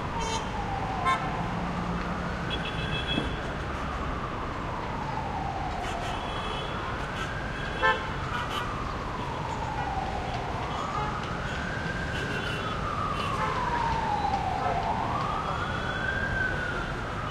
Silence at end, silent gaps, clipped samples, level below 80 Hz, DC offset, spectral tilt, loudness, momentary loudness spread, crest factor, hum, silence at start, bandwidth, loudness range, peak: 0 s; none; under 0.1%; -40 dBFS; under 0.1%; -5 dB/octave; -30 LUFS; 5 LU; 20 dB; none; 0 s; 14.5 kHz; 4 LU; -10 dBFS